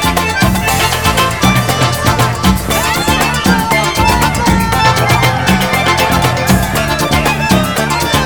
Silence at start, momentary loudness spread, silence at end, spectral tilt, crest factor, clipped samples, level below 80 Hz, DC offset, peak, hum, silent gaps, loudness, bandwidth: 0 s; 2 LU; 0 s; -4 dB/octave; 12 dB; 0.2%; -24 dBFS; 1%; 0 dBFS; none; none; -11 LUFS; over 20 kHz